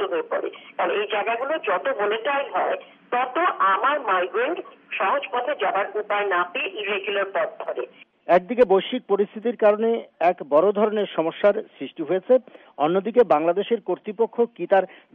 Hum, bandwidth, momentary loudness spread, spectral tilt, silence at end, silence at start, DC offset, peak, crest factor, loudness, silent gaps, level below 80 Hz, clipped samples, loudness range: none; 4.9 kHz; 9 LU; -2.5 dB/octave; 0.2 s; 0 s; under 0.1%; -6 dBFS; 16 dB; -23 LUFS; none; -70 dBFS; under 0.1%; 3 LU